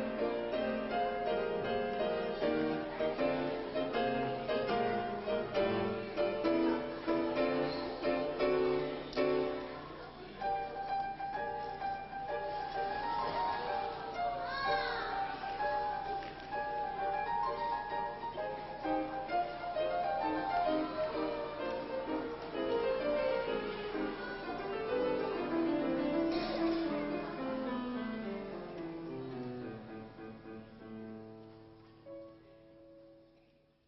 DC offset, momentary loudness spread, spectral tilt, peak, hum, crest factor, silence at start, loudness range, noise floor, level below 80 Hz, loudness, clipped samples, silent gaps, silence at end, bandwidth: under 0.1%; 10 LU; -3.5 dB/octave; -20 dBFS; none; 16 dB; 0 s; 9 LU; -68 dBFS; -60 dBFS; -36 LUFS; under 0.1%; none; 0.65 s; 6 kHz